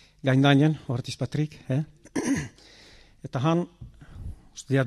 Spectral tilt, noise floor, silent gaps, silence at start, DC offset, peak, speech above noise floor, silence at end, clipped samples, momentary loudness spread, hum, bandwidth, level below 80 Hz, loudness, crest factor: -6.5 dB/octave; -53 dBFS; none; 0.25 s; under 0.1%; -8 dBFS; 28 dB; 0 s; under 0.1%; 23 LU; none; 12 kHz; -50 dBFS; -26 LUFS; 18 dB